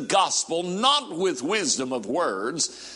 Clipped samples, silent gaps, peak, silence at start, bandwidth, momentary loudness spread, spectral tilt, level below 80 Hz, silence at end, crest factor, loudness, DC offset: under 0.1%; none; -4 dBFS; 0 s; 11.5 kHz; 6 LU; -2 dB/octave; -70 dBFS; 0 s; 20 dB; -24 LUFS; under 0.1%